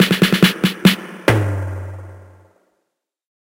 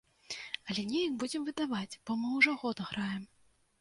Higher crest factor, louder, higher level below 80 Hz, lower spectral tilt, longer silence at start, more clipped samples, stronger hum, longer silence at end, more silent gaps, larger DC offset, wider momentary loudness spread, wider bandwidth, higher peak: second, 18 dB vs 24 dB; first, -16 LUFS vs -34 LUFS; first, -46 dBFS vs -72 dBFS; about the same, -5 dB/octave vs -4 dB/octave; second, 0 s vs 0.3 s; neither; neither; first, 1.2 s vs 0.55 s; neither; neither; first, 17 LU vs 13 LU; first, 17 kHz vs 11.5 kHz; first, 0 dBFS vs -12 dBFS